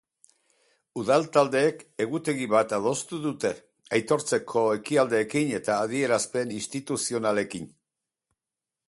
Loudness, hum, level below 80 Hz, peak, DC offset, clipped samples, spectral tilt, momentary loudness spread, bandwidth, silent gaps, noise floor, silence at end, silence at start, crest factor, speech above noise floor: -26 LUFS; none; -68 dBFS; -6 dBFS; under 0.1%; under 0.1%; -4.5 dB/octave; 9 LU; 11.5 kHz; none; -89 dBFS; 1.2 s; 0.95 s; 20 dB; 63 dB